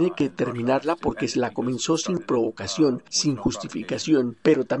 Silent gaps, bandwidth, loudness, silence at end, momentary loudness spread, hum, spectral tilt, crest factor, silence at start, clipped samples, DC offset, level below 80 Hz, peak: none; 10.5 kHz; -24 LUFS; 0 s; 6 LU; none; -4.5 dB/octave; 18 dB; 0 s; under 0.1%; 0.1%; -52 dBFS; -6 dBFS